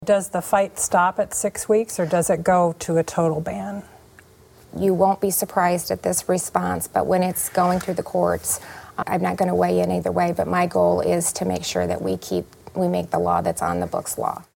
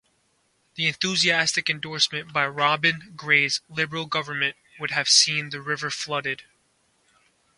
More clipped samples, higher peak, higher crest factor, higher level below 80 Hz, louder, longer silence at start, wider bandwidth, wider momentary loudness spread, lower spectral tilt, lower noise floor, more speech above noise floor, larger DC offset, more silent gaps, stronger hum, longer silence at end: neither; about the same, -2 dBFS vs -4 dBFS; about the same, 18 dB vs 22 dB; first, -54 dBFS vs -68 dBFS; about the same, -22 LUFS vs -22 LUFS; second, 0 s vs 0.75 s; first, 17.5 kHz vs 11.5 kHz; second, 7 LU vs 11 LU; first, -5 dB/octave vs -1.5 dB/octave; second, -50 dBFS vs -68 dBFS; second, 29 dB vs 43 dB; neither; neither; neither; second, 0.15 s vs 1.15 s